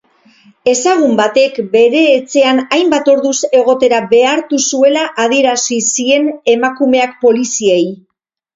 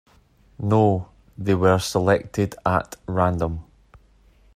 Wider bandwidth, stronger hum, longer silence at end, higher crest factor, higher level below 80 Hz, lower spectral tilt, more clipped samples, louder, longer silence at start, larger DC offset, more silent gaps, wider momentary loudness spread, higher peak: second, 8 kHz vs 15 kHz; neither; second, 0.6 s vs 0.95 s; second, 12 dB vs 18 dB; second, -58 dBFS vs -48 dBFS; second, -2.5 dB/octave vs -6.5 dB/octave; neither; first, -11 LUFS vs -22 LUFS; about the same, 0.65 s vs 0.6 s; neither; neither; second, 3 LU vs 11 LU; first, 0 dBFS vs -4 dBFS